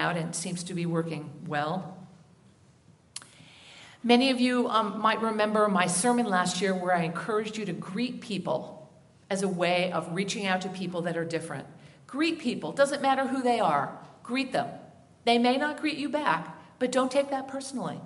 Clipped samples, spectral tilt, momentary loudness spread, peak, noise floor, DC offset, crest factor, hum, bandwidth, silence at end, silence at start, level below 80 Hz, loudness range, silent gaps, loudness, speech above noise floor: under 0.1%; -4.5 dB/octave; 14 LU; -6 dBFS; -59 dBFS; under 0.1%; 22 dB; none; 11.5 kHz; 0 s; 0 s; -74 dBFS; 5 LU; none; -28 LUFS; 31 dB